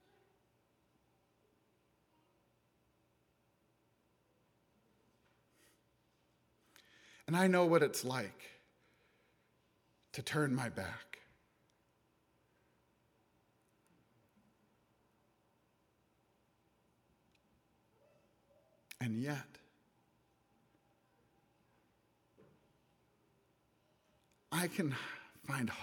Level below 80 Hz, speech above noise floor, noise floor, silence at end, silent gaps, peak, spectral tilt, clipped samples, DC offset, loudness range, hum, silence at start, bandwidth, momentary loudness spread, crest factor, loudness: -82 dBFS; 41 dB; -77 dBFS; 0 s; none; -18 dBFS; -5.5 dB/octave; under 0.1%; under 0.1%; 11 LU; 60 Hz at -70 dBFS; 7.3 s; 19.5 kHz; 24 LU; 26 dB; -37 LUFS